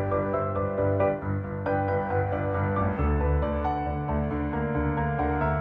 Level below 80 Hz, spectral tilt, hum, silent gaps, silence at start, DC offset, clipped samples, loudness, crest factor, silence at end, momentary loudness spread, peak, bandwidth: -34 dBFS; -11 dB/octave; none; none; 0 s; under 0.1%; under 0.1%; -27 LUFS; 14 dB; 0 s; 3 LU; -14 dBFS; 4.9 kHz